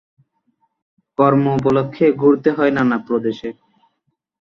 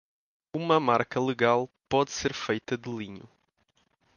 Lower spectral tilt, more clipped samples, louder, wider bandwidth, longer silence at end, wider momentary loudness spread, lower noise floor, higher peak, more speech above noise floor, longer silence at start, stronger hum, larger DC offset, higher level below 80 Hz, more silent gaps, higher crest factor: first, -9 dB/octave vs -5 dB/octave; neither; first, -16 LUFS vs -28 LUFS; about the same, 7 kHz vs 7.2 kHz; about the same, 1 s vs 0.9 s; about the same, 12 LU vs 14 LU; about the same, -71 dBFS vs -71 dBFS; first, -2 dBFS vs -8 dBFS; first, 55 dB vs 44 dB; first, 1.2 s vs 0.55 s; neither; neither; first, -56 dBFS vs -62 dBFS; neither; second, 16 dB vs 22 dB